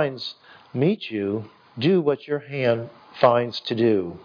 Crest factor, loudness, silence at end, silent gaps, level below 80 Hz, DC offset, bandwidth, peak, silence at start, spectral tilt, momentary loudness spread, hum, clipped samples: 20 dB; -23 LUFS; 0 s; none; -68 dBFS; under 0.1%; 5.2 kHz; -2 dBFS; 0 s; -8 dB/octave; 14 LU; none; under 0.1%